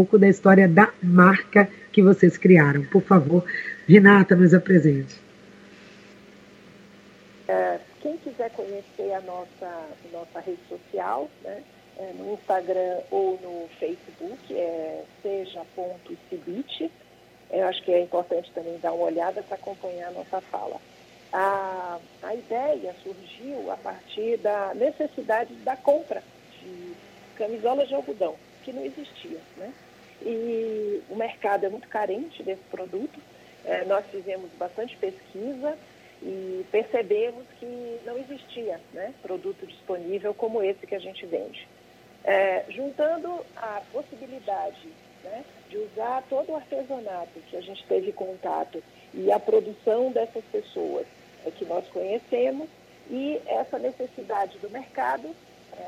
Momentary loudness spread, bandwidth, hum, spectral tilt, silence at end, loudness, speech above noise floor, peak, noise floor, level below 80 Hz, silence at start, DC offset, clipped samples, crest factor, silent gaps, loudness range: 22 LU; 7.8 kHz; none; -8 dB/octave; 0 s; -24 LUFS; 29 dB; 0 dBFS; -53 dBFS; -70 dBFS; 0 s; under 0.1%; under 0.1%; 24 dB; none; 15 LU